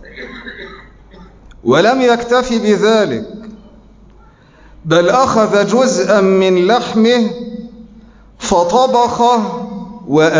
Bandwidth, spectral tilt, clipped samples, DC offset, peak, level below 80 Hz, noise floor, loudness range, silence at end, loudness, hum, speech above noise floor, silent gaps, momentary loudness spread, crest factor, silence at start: 7.6 kHz; -5 dB/octave; under 0.1%; under 0.1%; -2 dBFS; -44 dBFS; -44 dBFS; 3 LU; 0 s; -12 LUFS; none; 32 dB; none; 19 LU; 12 dB; 0 s